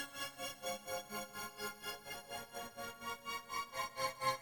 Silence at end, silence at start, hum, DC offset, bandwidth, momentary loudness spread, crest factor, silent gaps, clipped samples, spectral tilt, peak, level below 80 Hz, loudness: 0 s; 0 s; none; under 0.1%; 19.5 kHz; 7 LU; 22 dB; none; under 0.1%; -1.5 dB/octave; -22 dBFS; -74 dBFS; -44 LUFS